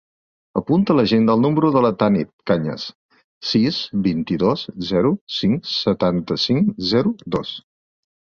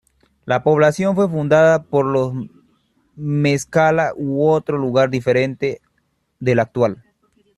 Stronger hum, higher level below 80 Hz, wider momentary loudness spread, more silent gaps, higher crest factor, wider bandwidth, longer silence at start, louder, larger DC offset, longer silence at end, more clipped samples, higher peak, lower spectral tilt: neither; first, -50 dBFS vs -56 dBFS; about the same, 10 LU vs 10 LU; first, 2.33-2.39 s, 2.95-3.09 s, 3.24-3.41 s, 5.21-5.27 s vs none; about the same, 16 dB vs 16 dB; second, 7 kHz vs 12.5 kHz; about the same, 0.55 s vs 0.45 s; about the same, -19 LUFS vs -17 LUFS; neither; about the same, 0.7 s vs 0.65 s; neither; about the same, -4 dBFS vs -2 dBFS; about the same, -7 dB/octave vs -6.5 dB/octave